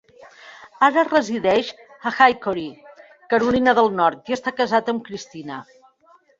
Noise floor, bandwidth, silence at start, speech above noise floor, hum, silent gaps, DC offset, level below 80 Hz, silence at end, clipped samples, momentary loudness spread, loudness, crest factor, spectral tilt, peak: -56 dBFS; 7.8 kHz; 0.45 s; 36 dB; none; none; under 0.1%; -58 dBFS; 0.75 s; under 0.1%; 17 LU; -19 LUFS; 20 dB; -4.5 dB/octave; -2 dBFS